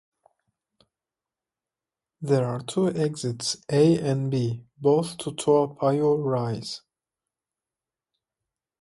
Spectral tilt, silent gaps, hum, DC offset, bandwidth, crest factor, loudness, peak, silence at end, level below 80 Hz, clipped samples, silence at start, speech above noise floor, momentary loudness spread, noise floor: -6 dB/octave; none; none; under 0.1%; 11.5 kHz; 18 dB; -25 LUFS; -8 dBFS; 2.05 s; -66 dBFS; under 0.1%; 2.2 s; over 66 dB; 10 LU; under -90 dBFS